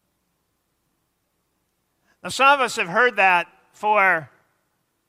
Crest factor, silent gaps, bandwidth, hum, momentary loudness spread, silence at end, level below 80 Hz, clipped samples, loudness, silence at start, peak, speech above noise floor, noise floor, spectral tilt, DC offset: 20 dB; none; 15.5 kHz; none; 14 LU; 0.85 s; -72 dBFS; under 0.1%; -18 LUFS; 2.25 s; -4 dBFS; 53 dB; -72 dBFS; -2.5 dB/octave; under 0.1%